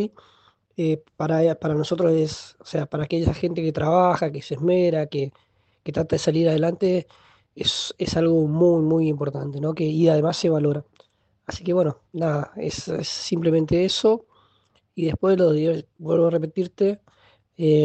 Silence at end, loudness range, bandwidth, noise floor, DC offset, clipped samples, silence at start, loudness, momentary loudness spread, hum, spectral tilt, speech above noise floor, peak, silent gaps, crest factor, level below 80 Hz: 0 s; 3 LU; 8.8 kHz; -64 dBFS; under 0.1%; under 0.1%; 0 s; -22 LUFS; 10 LU; none; -6.5 dB/octave; 43 dB; -6 dBFS; none; 16 dB; -50 dBFS